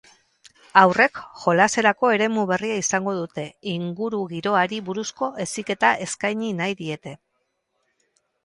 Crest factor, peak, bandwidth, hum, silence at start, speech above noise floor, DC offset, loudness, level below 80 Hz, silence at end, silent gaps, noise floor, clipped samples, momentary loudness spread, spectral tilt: 22 dB; 0 dBFS; 11.5 kHz; none; 0.75 s; 52 dB; under 0.1%; -22 LUFS; -66 dBFS; 1.3 s; none; -74 dBFS; under 0.1%; 13 LU; -4 dB/octave